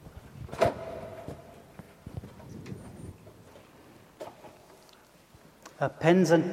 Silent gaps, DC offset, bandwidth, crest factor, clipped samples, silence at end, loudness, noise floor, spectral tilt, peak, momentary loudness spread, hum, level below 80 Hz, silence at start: none; under 0.1%; 15.5 kHz; 24 dB; under 0.1%; 0 s; -28 LUFS; -57 dBFS; -6.5 dB/octave; -8 dBFS; 28 LU; none; -58 dBFS; 0.05 s